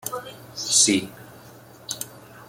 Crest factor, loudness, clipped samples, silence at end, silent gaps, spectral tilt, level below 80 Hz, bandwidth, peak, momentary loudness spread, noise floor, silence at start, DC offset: 22 dB; -21 LUFS; under 0.1%; 0.05 s; none; -1.5 dB/octave; -64 dBFS; 17 kHz; -4 dBFS; 22 LU; -46 dBFS; 0.05 s; under 0.1%